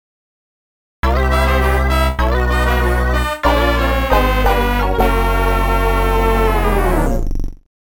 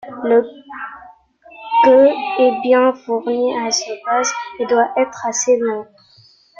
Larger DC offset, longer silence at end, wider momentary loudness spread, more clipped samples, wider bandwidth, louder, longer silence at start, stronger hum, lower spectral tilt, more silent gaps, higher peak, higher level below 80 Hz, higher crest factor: first, 0.3% vs under 0.1%; second, 0.25 s vs 0.75 s; second, 4 LU vs 18 LU; neither; first, 17.5 kHz vs 7.6 kHz; about the same, -16 LUFS vs -16 LUFS; first, 1.05 s vs 0.05 s; neither; first, -6 dB/octave vs -2 dB/octave; neither; about the same, 0 dBFS vs 0 dBFS; first, -18 dBFS vs -64 dBFS; about the same, 14 dB vs 16 dB